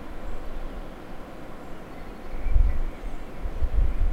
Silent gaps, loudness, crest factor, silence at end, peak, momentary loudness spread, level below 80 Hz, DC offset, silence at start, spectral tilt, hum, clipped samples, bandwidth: none; -34 LUFS; 18 dB; 0 s; -6 dBFS; 15 LU; -26 dBFS; under 0.1%; 0 s; -7.5 dB/octave; none; under 0.1%; 4.7 kHz